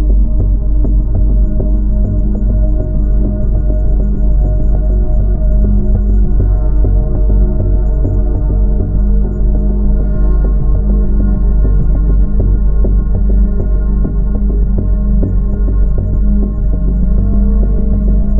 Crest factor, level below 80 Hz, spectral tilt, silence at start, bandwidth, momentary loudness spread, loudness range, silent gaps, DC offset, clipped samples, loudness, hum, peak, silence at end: 8 dB; -10 dBFS; -13.5 dB/octave; 0 s; 1.5 kHz; 2 LU; 1 LU; none; 0.7%; under 0.1%; -14 LUFS; none; -2 dBFS; 0 s